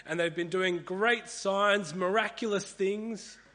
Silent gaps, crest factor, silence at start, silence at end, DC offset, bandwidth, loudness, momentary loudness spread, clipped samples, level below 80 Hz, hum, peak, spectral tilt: none; 18 dB; 0.05 s; 0.2 s; under 0.1%; 10 kHz; -30 LUFS; 6 LU; under 0.1%; -72 dBFS; none; -12 dBFS; -4 dB/octave